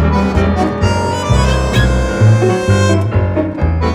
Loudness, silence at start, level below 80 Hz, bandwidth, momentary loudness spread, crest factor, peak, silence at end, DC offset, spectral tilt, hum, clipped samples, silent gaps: -13 LUFS; 0 s; -20 dBFS; 12 kHz; 5 LU; 12 dB; 0 dBFS; 0 s; under 0.1%; -6.5 dB/octave; none; under 0.1%; none